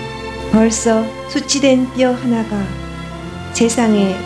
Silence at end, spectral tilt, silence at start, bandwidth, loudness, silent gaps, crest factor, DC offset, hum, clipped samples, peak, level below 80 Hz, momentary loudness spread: 0 s; -4.5 dB/octave; 0 s; 11 kHz; -16 LUFS; none; 16 dB; under 0.1%; none; under 0.1%; 0 dBFS; -38 dBFS; 14 LU